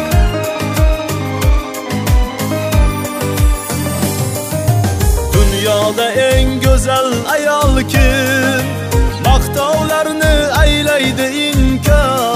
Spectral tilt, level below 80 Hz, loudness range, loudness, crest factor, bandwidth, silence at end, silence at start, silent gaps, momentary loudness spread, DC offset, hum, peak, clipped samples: -5 dB/octave; -16 dBFS; 3 LU; -14 LUFS; 12 dB; 16 kHz; 0 s; 0 s; none; 6 LU; under 0.1%; none; 0 dBFS; under 0.1%